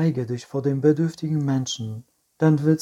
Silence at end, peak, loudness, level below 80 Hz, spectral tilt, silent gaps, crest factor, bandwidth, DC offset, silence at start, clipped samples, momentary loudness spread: 0 s; -6 dBFS; -23 LUFS; -64 dBFS; -7 dB/octave; none; 16 dB; 11.5 kHz; under 0.1%; 0 s; under 0.1%; 10 LU